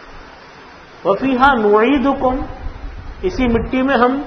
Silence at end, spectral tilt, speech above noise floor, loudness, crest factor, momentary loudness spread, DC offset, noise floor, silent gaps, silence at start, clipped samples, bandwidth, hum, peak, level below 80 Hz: 0 s; -7 dB/octave; 25 dB; -15 LUFS; 16 dB; 19 LU; under 0.1%; -39 dBFS; none; 0 s; under 0.1%; 6.4 kHz; none; 0 dBFS; -32 dBFS